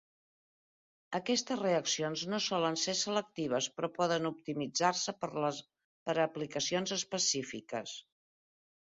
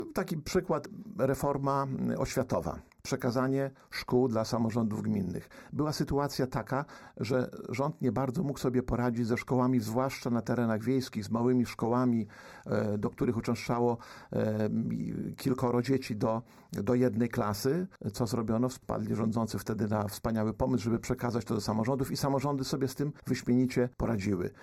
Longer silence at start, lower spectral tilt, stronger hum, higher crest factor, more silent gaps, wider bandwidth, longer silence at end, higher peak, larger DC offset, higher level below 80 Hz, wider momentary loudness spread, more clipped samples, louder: first, 1.1 s vs 0 s; second, -2.5 dB/octave vs -6.5 dB/octave; neither; first, 22 dB vs 14 dB; first, 5.84-6.06 s vs none; second, 7.6 kHz vs 15 kHz; first, 0.85 s vs 0 s; about the same, -14 dBFS vs -16 dBFS; neither; second, -76 dBFS vs -54 dBFS; about the same, 9 LU vs 7 LU; neither; about the same, -34 LUFS vs -32 LUFS